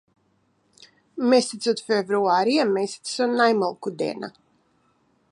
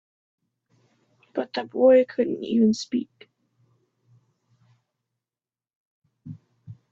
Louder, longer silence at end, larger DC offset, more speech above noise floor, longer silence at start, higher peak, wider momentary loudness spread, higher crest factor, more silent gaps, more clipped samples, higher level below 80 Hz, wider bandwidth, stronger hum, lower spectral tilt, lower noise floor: about the same, -22 LUFS vs -22 LUFS; first, 1.05 s vs 0.2 s; neither; second, 44 dB vs over 68 dB; second, 1.15 s vs 1.35 s; about the same, -6 dBFS vs -8 dBFS; second, 9 LU vs 27 LU; about the same, 18 dB vs 20 dB; second, none vs 5.76-6.02 s; neither; second, -78 dBFS vs -72 dBFS; first, 11 kHz vs 7.6 kHz; neither; second, -4 dB/octave vs -6 dB/octave; second, -66 dBFS vs under -90 dBFS